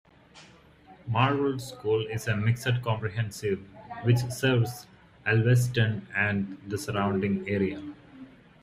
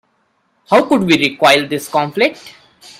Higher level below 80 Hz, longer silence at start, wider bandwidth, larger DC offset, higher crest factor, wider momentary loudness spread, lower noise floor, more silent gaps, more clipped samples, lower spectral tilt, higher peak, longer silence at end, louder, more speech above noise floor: about the same, -58 dBFS vs -58 dBFS; second, 0.35 s vs 0.7 s; about the same, 15.5 kHz vs 16 kHz; neither; about the same, 20 dB vs 16 dB; first, 11 LU vs 7 LU; second, -54 dBFS vs -62 dBFS; neither; neither; first, -6 dB/octave vs -4.5 dB/octave; second, -8 dBFS vs 0 dBFS; second, 0.35 s vs 0.5 s; second, -28 LUFS vs -13 LUFS; second, 27 dB vs 48 dB